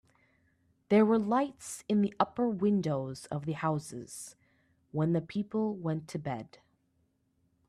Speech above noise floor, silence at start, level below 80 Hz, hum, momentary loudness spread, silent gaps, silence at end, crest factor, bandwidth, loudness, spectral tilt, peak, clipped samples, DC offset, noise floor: 44 dB; 0.9 s; -70 dBFS; none; 16 LU; none; 1.2 s; 22 dB; 13 kHz; -31 LUFS; -7 dB/octave; -10 dBFS; under 0.1%; under 0.1%; -74 dBFS